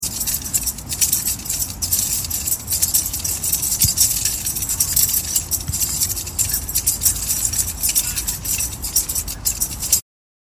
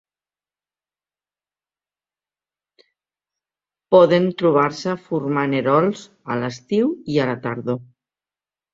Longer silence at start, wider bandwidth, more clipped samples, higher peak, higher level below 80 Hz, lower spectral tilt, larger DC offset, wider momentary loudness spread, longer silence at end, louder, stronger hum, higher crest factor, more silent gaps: second, 0 s vs 3.9 s; first, 17.5 kHz vs 7.8 kHz; neither; about the same, 0 dBFS vs -2 dBFS; first, -36 dBFS vs -64 dBFS; second, -0.5 dB/octave vs -7 dB/octave; neither; second, 6 LU vs 12 LU; second, 0.45 s vs 0.9 s; about the same, -18 LUFS vs -19 LUFS; second, none vs 50 Hz at -55 dBFS; about the same, 20 dB vs 20 dB; neither